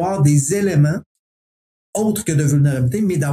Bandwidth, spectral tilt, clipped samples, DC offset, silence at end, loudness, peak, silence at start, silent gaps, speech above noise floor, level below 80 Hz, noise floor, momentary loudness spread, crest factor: 14.5 kHz; -6.5 dB/octave; under 0.1%; under 0.1%; 0 s; -17 LUFS; -2 dBFS; 0 s; 1.06-1.93 s; over 74 dB; -50 dBFS; under -90 dBFS; 6 LU; 14 dB